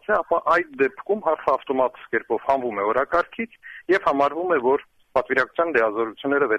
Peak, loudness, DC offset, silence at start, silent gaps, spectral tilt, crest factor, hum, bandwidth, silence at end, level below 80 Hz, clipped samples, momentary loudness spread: -6 dBFS; -22 LUFS; under 0.1%; 0.1 s; none; -6 dB/octave; 16 dB; none; 8.8 kHz; 0 s; -58 dBFS; under 0.1%; 6 LU